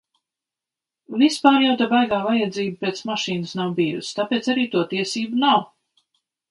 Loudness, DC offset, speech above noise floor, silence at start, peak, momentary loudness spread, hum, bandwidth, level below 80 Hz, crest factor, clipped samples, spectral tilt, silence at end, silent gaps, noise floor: -21 LUFS; under 0.1%; 68 dB; 1.1 s; 0 dBFS; 9 LU; none; 11.5 kHz; -66 dBFS; 22 dB; under 0.1%; -4.5 dB/octave; 0.85 s; none; -88 dBFS